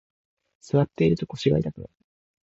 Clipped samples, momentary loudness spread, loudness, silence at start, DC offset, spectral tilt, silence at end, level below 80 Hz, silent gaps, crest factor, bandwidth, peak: under 0.1%; 9 LU; -24 LUFS; 0.75 s; under 0.1%; -8 dB/octave; 0.6 s; -50 dBFS; none; 18 dB; 8 kHz; -8 dBFS